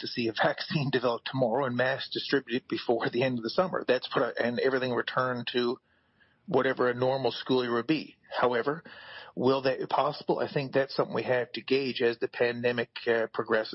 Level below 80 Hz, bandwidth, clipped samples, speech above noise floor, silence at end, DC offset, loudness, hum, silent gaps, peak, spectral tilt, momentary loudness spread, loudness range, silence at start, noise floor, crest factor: -72 dBFS; 6 kHz; under 0.1%; 38 dB; 0 s; under 0.1%; -29 LUFS; none; none; -14 dBFS; -8.5 dB/octave; 4 LU; 1 LU; 0 s; -66 dBFS; 16 dB